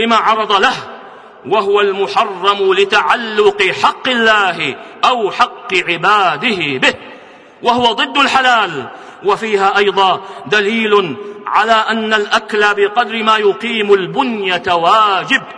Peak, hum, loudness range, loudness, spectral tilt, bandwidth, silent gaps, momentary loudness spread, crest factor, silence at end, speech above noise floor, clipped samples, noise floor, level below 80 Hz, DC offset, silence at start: 0 dBFS; none; 1 LU; -13 LUFS; -3.5 dB/octave; 10.5 kHz; none; 6 LU; 14 dB; 0 s; 25 dB; under 0.1%; -38 dBFS; -54 dBFS; under 0.1%; 0 s